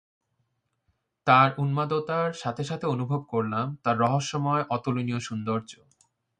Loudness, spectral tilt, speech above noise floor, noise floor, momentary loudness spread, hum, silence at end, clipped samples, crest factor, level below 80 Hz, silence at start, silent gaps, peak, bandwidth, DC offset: -26 LUFS; -6 dB/octave; 50 dB; -76 dBFS; 11 LU; none; 0.65 s; under 0.1%; 22 dB; -66 dBFS; 1.25 s; none; -6 dBFS; 9.6 kHz; under 0.1%